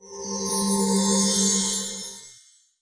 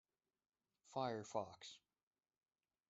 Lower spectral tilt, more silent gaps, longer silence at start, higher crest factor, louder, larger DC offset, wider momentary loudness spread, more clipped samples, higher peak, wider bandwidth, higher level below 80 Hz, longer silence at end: second, -3 dB/octave vs -4.5 dB/octave; neither; second, 0 s vs 0.85 s; second, 16 dB vs 24 dB; first, -22 LUFS vs -48 LUFS; neither; about the same, 14 LU vs 13 LU; neither; first, -10 dBFS vs -28 dBFS; first, 10.5 kHz vs 8 kHz; first, -60 dBFS vs -90 dBFS; second, 0.5 s vs 1.15 s